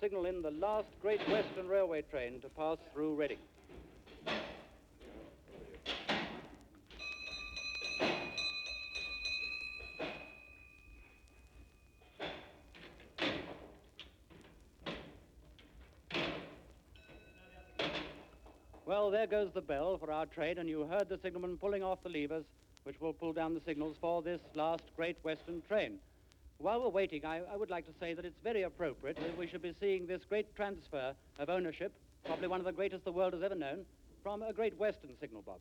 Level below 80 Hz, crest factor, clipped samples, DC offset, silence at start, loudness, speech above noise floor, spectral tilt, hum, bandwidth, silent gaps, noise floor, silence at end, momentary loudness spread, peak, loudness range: -62 dBFS; 20 dB; under 0.1%; under 0.1%; 0 s; -39 LUFS; 25 dB; -5 dB/octave; none; 19.5 kHz; none; -64 dBFS; 0 s; 20 LU; -22 dBFS; 8 LU